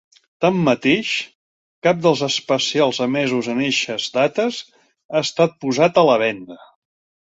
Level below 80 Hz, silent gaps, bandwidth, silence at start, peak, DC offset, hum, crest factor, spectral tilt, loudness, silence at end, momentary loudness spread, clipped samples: -62 dBFS; 1.35-1.82 s, 5.05-5.09 s; 8 kHz; 0.4 s; -2 dBFS; under 0.1%; none; 18 dB; -4.5 dB/octave; -18 LUFS; 0.75 s; 8 LU; under 0.1%